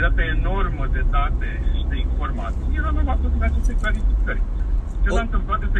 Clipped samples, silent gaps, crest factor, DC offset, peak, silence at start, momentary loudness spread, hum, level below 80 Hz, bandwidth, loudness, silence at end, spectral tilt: under 0.1%; none; 14 dB; under 0.1%; -6 dBFS; 0 s; 4 LU; none; -20 dBFS; 8 kHz; -24 LUFS; 0 s; -7 dB/octave